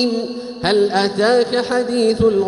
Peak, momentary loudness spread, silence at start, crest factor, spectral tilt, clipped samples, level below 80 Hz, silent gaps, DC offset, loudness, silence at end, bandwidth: -4 dBFS; 7 LU; 0 s; 12 dB; -5 dB/octave; under 0.1%; -46 dBFS; none; under 0.1%; -17 LUFS; 0 s; 11.5 kHz